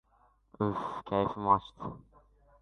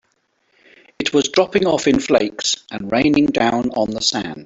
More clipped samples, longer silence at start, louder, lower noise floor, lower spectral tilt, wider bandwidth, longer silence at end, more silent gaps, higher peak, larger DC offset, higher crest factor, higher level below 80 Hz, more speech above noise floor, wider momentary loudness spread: neither; second, 0.6 s vs 1 s; second, -32 LUFS vs -17 LUFS; about the same, -68 dBFS vs -65 dBFS; first, -8.5 dB/octave vs -3.5 dB/octave; about the same, 8.6 kHz vs 8 kHz; first, 0.65 s vs 0 s; neither; second, -12 dBFS vs -2 dBFS; neither; first, 22 dB vs 16 dB; second, -60 dBFS vs -50 dBFS; second, 36 dB vs 48 dB; first, 15 LU vs 5 LU